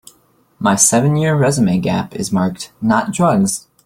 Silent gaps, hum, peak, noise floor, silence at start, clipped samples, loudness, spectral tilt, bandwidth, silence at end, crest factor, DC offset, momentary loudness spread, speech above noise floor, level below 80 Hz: none; none; 0 dBFS; -55 dBFS; 0.6 s; under 0.1%; -15 LUFS; -5 dB/octave; 16 kHz; 0.25 s; 16 dB; under 0.1%; 9 LU; 40 dB; -50 dBFS